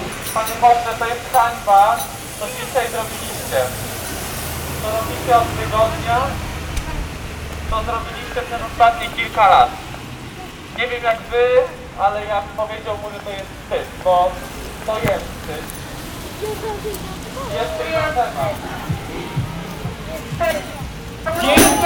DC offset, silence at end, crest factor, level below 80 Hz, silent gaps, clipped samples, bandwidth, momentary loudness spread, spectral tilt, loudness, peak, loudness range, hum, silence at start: under 0.1%; 0 s; 18 dB; -34 dBFS; none; under 0.1%; over 20 kHz; 15 LU; -4 dB/octave; -20 LUFS; 0 dBFS; 6 LU; none; 0 s